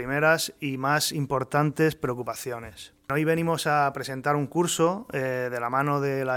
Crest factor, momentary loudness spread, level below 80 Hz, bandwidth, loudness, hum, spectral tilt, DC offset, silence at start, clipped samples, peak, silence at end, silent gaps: 18 dB; 9 LU; -60 dBFS; 18 kHz; -26 LUFS; none; -4.5 dB/octave; under 0.1%; 0 s; under 0.1%; -8 dBFS; 0 s; none